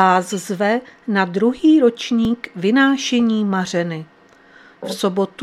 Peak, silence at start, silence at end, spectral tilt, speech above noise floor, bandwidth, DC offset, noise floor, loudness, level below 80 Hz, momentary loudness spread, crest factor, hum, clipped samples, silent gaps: 0 dBFS; 0 s; 0 s; -5 dB/octave; 31 dB; 13.5 kHz; under 0.1%; -48 dBFS; -18 LUFS; -56 dBFS; 10 LU; 18 dB; none; under 0.1%; none